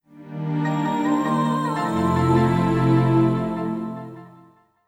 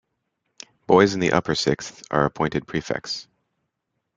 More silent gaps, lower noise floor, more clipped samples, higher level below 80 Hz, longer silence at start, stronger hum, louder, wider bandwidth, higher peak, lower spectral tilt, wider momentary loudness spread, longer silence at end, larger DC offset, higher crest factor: neither; second, -53 dBFS vs -78 dBFS; neither; first, -46 dBFS vs -54 dBFS; second, 0.15 s vs 0.9 s; neither; about the same, -21 LUFS vs -22 LUFS; first, 13.5 kHz vs 9.4 kHz; second, -6 dBFS vs -2 dBFS; first, -8 dB/octave vs -5 dB/octave; about the same, 13 LU vs 13 LU; second, 0.6 s vs 0.95 s; neither; second, 14 dB vs 22 dB